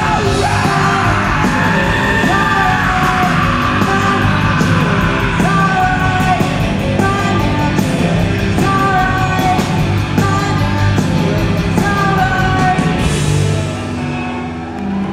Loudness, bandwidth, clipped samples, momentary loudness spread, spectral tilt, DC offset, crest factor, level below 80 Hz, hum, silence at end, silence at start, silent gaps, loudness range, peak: -13 LUFS; 15.5 kHz; under 0.1%; 3 LU; -5.5 dB/octave; under 0.1%; 12 dB; -26 dBFS; none; 0 s; 0 s; none; 2 LU; 0 dBFS